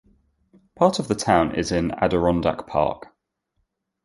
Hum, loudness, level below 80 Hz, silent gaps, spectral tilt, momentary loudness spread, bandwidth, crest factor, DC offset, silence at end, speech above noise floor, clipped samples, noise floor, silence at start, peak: none; -22 LUFS; -44 dBFS; none; -5.5 dB/octave; 5 LU; 11.5 kHz; 20 dB; under 0.1%; 1.05 s; 53 dB; under 0.1%; -74 dBFS; 0.8 s; -2 dBFS